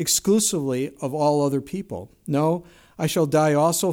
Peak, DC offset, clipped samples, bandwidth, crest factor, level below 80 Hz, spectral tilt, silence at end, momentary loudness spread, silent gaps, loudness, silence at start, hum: -8 dBFS; under 0.1%; under 0.1%; 18 kHz; 14 dB; -58 dBFS; -4.5 dB/octave; 0 s; 12 LU; none; -22 LUFS; 0 s; none